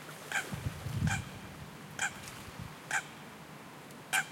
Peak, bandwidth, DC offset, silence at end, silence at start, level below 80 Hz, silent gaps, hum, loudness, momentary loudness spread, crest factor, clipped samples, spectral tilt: -18 dBFS; 16.5 kHz; under 0.1%; 0 s; 0 s; -58 dBFS; none; none; -38 LUFS; 15 LU; 22 dB; under 0.1%; -3.5 dB/octave